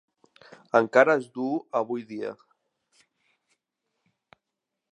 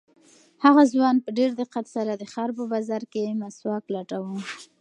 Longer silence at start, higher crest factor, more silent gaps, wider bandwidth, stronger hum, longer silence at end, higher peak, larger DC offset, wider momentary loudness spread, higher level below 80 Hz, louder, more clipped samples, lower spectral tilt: first, 0.75 s vs 0.6 s; about the same, 26 dB vs 22 dB; neither; about the same, 10 kHz vs 10 kHz; neither; first, 2.6 s vs 0.15 s; about the same, -4 dBFS vs -2 dBFS; neither; about the same, 16 LU vs 14 LU; about the same, -84 dBFS vs -80 dBFS; about the same, -25 LUFS vs -24 LUFS; neither; about the same, -6 dB/octave vs -6 dB/octave